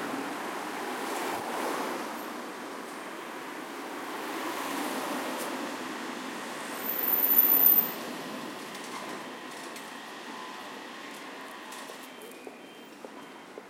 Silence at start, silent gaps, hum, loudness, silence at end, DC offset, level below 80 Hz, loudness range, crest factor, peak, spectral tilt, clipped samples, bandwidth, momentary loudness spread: 0 s; none; none; -29 LUFS; 0 s; under 0.1%; -86 dBFS; 17 LU; 24 dB; -10 dBFS; -2.5 dB/octave; under 0.1%; 16.5 kHz; 21 LU